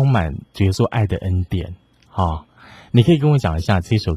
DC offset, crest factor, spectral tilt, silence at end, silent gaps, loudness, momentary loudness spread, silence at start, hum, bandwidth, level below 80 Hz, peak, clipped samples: under 0.1%; 16 dB; -7.5 dB/octave; 0 s; none; -19 LUFS; 12 LU; 0 s; none; 12.5 kHz; -30 dBFS; -2 dBFS; under 0.1%